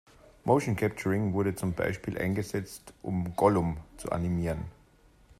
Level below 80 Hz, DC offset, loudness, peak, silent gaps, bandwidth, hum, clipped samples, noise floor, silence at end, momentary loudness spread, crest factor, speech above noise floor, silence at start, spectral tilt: -52 dBFS; under 0.1%; -30 LUFS; -10 dBFS; none; 14.5 kHz; none; under 0.1%; -60 dBFS; 0.7 s; 12 LU; 20 dB; 31 dB; 0.45 s; -7 dB/octave